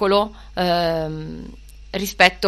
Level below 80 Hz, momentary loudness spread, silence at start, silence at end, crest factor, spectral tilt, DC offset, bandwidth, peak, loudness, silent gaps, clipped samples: -40 dBFS; 19 LU; 0 s; 0 s; 20 dB; -4 dB/octave; under 0.1%; 13.5 kHz; 0 dBFS; -21 LUFS; none; under 0.1%